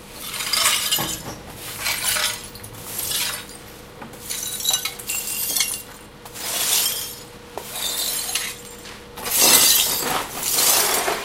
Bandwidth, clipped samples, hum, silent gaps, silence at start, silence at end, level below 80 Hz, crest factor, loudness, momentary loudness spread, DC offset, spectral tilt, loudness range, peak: 17 kHz; under 0.1%; none; none; 0 s; 0 s; -50 dBFS; 24 dB; -19 LUFS; 21 LU; under 0.1%; 0 dB/octave; 7 LU; 0 dBFS